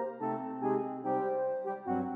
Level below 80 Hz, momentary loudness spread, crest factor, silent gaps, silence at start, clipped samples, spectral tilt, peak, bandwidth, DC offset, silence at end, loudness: -84 dBFS; 4 LU; 14 dB; none; 0 s; under 0.1%; -10.5 dB/octave; -20 dBFS; 3.9 kHz; under 0.1%; 0 s; -34 LUFS